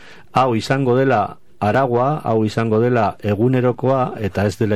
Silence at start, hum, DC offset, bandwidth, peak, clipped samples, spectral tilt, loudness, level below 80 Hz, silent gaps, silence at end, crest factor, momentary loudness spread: 0.35 s; none; 0.9%; 13.5 kHz; -2 dBFS; under 0.1%; -7.5 dB/octave; -18 LUFS; -52 dBFS; none; 0 s; 14 dB; 5 LU